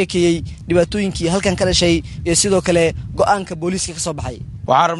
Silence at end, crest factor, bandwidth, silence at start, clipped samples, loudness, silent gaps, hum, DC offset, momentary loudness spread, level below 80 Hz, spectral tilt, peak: 0 s; 16 dB; 11.5 kHz; 0 s; under 0.1%; -17 LUFS; none; none; under 0.1%; 9 LU; -34 dBFS; -4 dB/octave; 0 dBFS